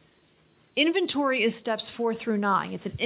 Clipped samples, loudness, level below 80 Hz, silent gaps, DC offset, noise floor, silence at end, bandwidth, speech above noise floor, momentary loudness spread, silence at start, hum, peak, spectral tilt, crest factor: under 0.1%; -26 LUFS; -60 dBFS; none; under 0.1%; -62 dBFS; 0 s; 4 kHz; 36 dB; 8 LU; 0.75 s; none; -10 dBFS; -9 dB/octave; 18 dB